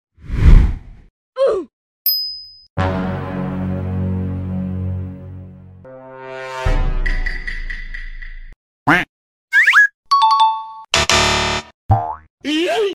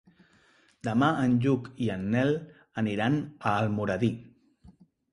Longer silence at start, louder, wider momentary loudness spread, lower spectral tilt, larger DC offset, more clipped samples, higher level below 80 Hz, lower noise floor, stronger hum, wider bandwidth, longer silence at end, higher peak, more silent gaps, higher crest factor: second, 0.25 s vs 0.85 s; first, -17 LUFS vs -28 LUFS; first, 20 LU vs 8 LU; second, -4 dB/octave vs -7.5 dB/octave; neither; neither; first, -22 dBFS vs -58 dBFS; second, -38 dBFS vs -63 dBFS; neither; first, 15 kHz vs 11 kHz; second, 0 s vs 0.4 s; first, 0 dBFS vs -10 dBFS; first, 1.10-1.33 s, 1.73-2.05 s, 2.70-2.77 s, 8.56-8.86 s, 9.09-9.48 s, 9.94-10.03 s, 11.74-11.89 s, 12.30-12.38 s vs none; about the same, 18 dB vs 18 dB